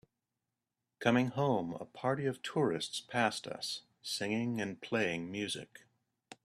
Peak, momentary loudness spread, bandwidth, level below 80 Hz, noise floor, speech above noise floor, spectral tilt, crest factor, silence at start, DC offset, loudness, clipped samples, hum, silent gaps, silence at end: -12 dBFS; 9 LU; 14.5 kHz; -76 dBFS; -89 dBFS; 54 dB; -5 dB/octave; 24 dB; 1 s; under 0.1%; -35 LUFS; under 0.1%; none; none; 0.1 s